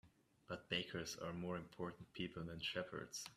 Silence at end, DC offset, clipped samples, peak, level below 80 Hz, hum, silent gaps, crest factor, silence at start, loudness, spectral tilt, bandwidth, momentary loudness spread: 0 s; under 0.1%; under 0.1%; -26 dBFS; -74 dBFS; none; none; 22 dB; 0.05 s; -47 LUFS; -4 dB/octave; 14.5 kHz; 7 LU